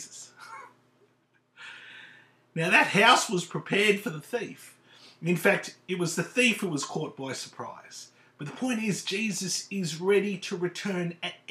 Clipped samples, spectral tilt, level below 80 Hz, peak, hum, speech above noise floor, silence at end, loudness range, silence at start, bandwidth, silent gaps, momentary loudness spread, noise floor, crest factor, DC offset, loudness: under 0.1%; -3.5 dB/octave; -84 dBFS; -6 dBFS; none; 41 dB; 0.15 s; 5 LU; 0 s; 15 kHz; none; 23 LU; -68 dBFS; 24 dB; under 0.1%; -27 LUFS